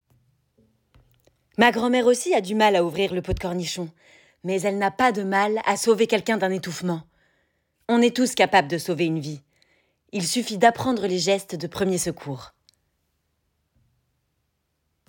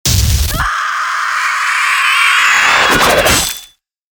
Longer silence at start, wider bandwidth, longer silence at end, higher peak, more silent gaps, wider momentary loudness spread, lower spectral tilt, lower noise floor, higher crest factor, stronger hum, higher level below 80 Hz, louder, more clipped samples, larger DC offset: first, 1.6 s vs 0.05 s; second, 17 kHz vs over 20 kHz; first, 2.6 s vs 0.45 s; second, -4 dBFS vs 0 dBFS; neither; first, 14 LU vs 7 LU; first, -4 dB/octave vs -2 dB/octave; first, -74 dBFS vs -42 dBFS; first, 20 dB vs 12 dB; neither; second, -50 dBFS vs -24 dBFS; second, -22 LUFS vs -10 LUFS; neither; neither